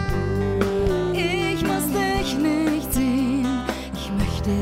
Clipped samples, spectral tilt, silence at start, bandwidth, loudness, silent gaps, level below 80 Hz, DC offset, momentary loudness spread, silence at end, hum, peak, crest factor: under 0.1%; -5.5 dB/octave; 0 s; 16 kHz; -23 LUFS; none; -34 dBFS; under 0.1%; 4 LU; 0 s; none; -6 dBFS; 16 dB